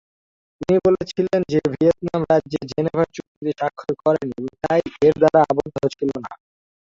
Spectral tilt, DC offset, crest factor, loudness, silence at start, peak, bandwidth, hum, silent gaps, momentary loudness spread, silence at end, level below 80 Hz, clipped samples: -7.5 dB/octave; under 0.1%; 18 dB; -20 LUFS; 0.6 s; -2 dBFS; 7.6 kHz; none; 3.27-3.41 s; 12 LU; 0.5 s; -52 dBFS; under 0.1%